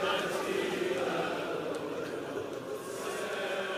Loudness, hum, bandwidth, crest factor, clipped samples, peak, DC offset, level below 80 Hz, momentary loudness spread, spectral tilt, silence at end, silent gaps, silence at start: -34 LUFS; none; 15.5 kHz; 14 dB; under 0.1%; -20 dBFS; under 0.1%; -70 dBFS; 6 LU; -4 dB/octave; 0 s; none; 0 s